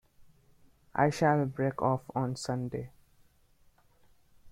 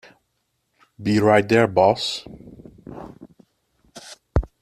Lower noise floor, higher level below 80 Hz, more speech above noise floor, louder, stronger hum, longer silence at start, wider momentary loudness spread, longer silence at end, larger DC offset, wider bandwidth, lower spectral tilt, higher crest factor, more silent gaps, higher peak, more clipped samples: second, -64 dBFS vs -72 dBFS; second, -62 dBFS vs -38 dBFS; second, 35 dB vs 54 dB; second, -31 LUFS vs -19 LUFS; neither; second, 0.2 s vs 1 s; second, 12 LU vs 26 LU; second, 0 s vs 0.15 s; neither; about the same, 15 kHz vs 14.5 kHz; about the same, -6.5 dB/octave vs -6 dB/octave; about the same, 22 dB vs 22 dB; neither; second, -12 dBFS vs -2 dBFS; neither